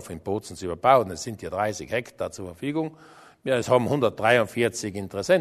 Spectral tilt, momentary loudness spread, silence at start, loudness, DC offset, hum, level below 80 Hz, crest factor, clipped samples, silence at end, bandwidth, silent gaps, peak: -5 dB/octave; 13 LU; 0 s; -25 LUFS; under 0.1%; none; -58 dBFS; 22 dB; under 0.1%; 0 s; 13.5 kHz; none; -4 dBFS